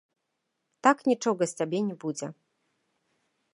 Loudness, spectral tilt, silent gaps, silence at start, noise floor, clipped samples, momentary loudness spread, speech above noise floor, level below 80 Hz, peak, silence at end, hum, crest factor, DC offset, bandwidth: -27 LUFS; -5 dB/octave; none; 0.85 s; -81 dBFS; under 0.1%; 12 LU; 54 dB; -82 dBFS; -6 dBFS; 1.25 s; none; 24 dB; under 0.1%; 11.5 kHz